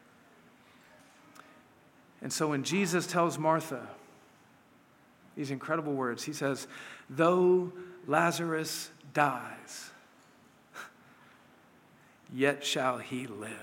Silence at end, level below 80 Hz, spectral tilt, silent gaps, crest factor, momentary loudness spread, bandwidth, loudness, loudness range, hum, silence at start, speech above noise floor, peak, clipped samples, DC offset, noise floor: 0 s; -84 dBFS; -4.5 dB/octave; none; 24 dB; 19 LU; 17 kHz; -31 LUFS; 7 LU; none; 1.35 s; 31 dB; -10 dBFS; under 0.1%; under 0.1%; -62 dBFS